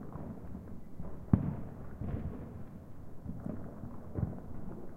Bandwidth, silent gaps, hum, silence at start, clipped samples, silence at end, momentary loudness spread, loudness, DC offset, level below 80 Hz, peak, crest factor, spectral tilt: 15 kHz; none; none; 0 s; under 0.1%; 0 s; 16 LU; -41 LUFS; under 0.1%; -48 dBFS; -10 dBFS; 28 dB; -10.5 dB/octave